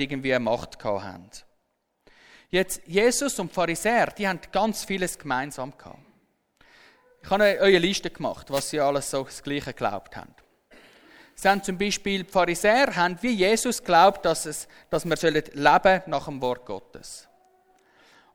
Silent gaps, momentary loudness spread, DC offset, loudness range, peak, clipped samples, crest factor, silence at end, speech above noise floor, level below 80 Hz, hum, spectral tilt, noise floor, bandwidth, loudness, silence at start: none; 15 LU; under 0.1%; 7 LU; -2 dBFS; under 0.1%; 24 dB; 1.15 s; 49 dB; -52 dBFS; none; -3.5 dB/octave; -74 dBFS; over 20 kHz; -24 LUFS; 0 s